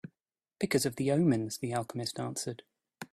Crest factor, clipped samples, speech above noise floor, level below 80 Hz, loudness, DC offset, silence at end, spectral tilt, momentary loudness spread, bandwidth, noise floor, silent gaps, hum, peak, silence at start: 20 dB; under 0.1%; 58 dB; -68 dBFS; -32 LUFS; under 0.1%; 0.05 s; -5 dB/octave; 17 LU; 15.5 kHz; -89 dBFS; none; none; -14 dBFS; 0.05 s